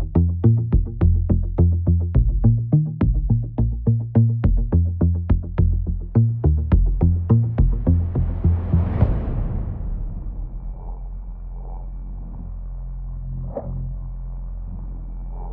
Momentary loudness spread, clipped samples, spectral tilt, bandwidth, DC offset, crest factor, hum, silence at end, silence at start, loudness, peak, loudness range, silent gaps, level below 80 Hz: 17 LU; under 0.1%; -14 dB/octave; 2.9 kHz; under 0.1%; 16 dB; none; 0 s; 0 s; -21 LUFS; -4 dBFS; 14 LU; none; -24 dBFS